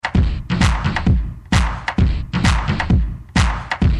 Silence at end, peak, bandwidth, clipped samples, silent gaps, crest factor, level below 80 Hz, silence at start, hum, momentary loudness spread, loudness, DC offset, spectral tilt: 0 s; -2 dBFS; 12 kHz; under 0.1%; none; 16 dB; -20 dBFS; 0.05 s; none; 3 LU; -19 LUFS; under 0.1%; -5.5 dB/octave